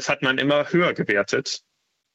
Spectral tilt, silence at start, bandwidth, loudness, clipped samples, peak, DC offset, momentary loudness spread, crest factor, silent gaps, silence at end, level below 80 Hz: -4.5 dB/octave; 0 s; 8.4 kHz; -21 LUFS; under 0.1%; -6 dBFS; under 0.1%; 8 LU; 16 dB; none; 0.55 s; -66 dBFS